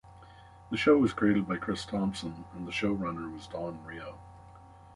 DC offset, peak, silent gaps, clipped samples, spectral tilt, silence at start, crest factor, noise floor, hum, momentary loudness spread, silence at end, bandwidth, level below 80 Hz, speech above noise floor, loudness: under 0.1%; -12 dBFS; none; under 0.1%; -6 dB/octave; 0.05 s; 18 dB; -53 dBFS; none; 18 LU; 0 s; 11.5 kHz; -56 dBFS; 23 dB; -30 LUFS